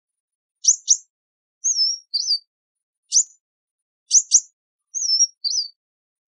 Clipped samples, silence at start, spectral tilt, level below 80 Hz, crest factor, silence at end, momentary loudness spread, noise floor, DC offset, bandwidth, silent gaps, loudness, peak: under 0.1%; 0.65 s; 14 dB/octave; under -90 dBFS; 22 dB; 0.65 s; 9 LU; under -90 dBFS; under 0.1%; 11.5 kHz; 1.10-1.61 s, 2.47-2.75 s, 2.83-3.03 s, 3.40-4.06 s, 4.53-4.79 s, 5.37-5.41 s; -18 LUFS; -2 dBFS